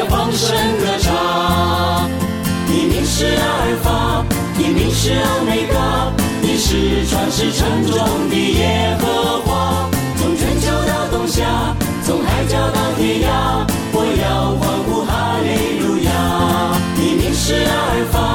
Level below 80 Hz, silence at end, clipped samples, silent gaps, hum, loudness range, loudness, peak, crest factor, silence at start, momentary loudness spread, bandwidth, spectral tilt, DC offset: -26 dBFS; 0 s; under 0.1%; none; none; 1 LU; -16 LUFS; -2 dBFS; 14 dB; 0 s; 3 LU; 19 kHz; -5 dB/octave; under 0.1%